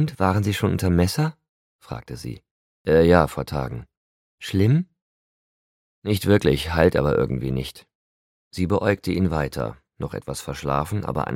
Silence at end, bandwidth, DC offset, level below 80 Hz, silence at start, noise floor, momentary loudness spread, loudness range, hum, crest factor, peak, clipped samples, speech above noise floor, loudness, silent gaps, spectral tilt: 0 s; 16.5 kHz; under 0.1%; -40 dBFS; 0 s; under -90 dBFS; 16 LU; 4 LU; none; 22 dB; 0 dBFS; under 0.1%; over 69 dB; -22 LUFS; 1.49-1.79 s, 2.51-2.85 s, 3.97-4.38 s, 5.02-6.02 s, 7.95-8.51 s; -6.5 dB/octave